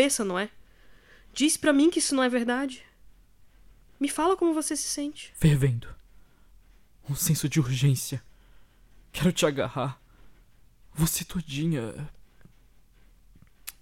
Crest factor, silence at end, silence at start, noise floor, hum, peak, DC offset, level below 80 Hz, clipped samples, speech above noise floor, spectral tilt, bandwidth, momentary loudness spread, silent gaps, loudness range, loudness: 20 dB; 0.1 s; 0 s; -56 dBFS; none; -8 dBFS; under 0.1%; -50 dBFS; under 0.1%; 31 dB; -4.5 dB/octave; 17 kHz; 17 LU; none; 6 LU; -26 LUFS